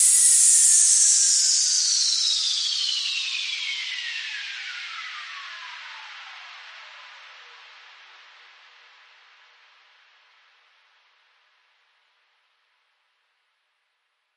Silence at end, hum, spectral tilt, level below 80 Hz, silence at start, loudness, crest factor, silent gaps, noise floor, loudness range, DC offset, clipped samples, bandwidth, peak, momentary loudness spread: 7 s; none; 8.5 dB/octave; under -90 dBFS; 0 s; -18 LUFS; 24 dB; none; -74 dBFS; 26 LU; under 0.1%; under 0.1%; 11.5 kHz; -2 dBFS; 26 LU